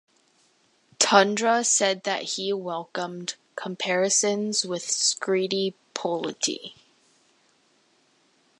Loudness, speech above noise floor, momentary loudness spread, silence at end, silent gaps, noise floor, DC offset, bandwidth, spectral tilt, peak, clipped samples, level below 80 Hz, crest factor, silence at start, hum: -24 LUFS; 40 dB; 13 LU; 1.9 s; none; -65 dBFS; under 0.1%; 11.5 kHz; -2 dB/octave; -2 dBFS; under 0.1%; -80 dBFS; 26 dB; 1 s; none